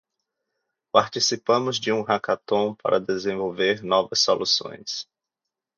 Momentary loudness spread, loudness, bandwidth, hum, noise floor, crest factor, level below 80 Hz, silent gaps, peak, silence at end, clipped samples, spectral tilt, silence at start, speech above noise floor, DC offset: 10 LU; -23 LUFS; 7.4 kHz; none; -86 dBFS; 22 dB; -66 dBFS; none; -2 dBFS; 0.75 s; under 0.1%; -3 dB/octave; 0.95 s; 63 dB; under 0.1%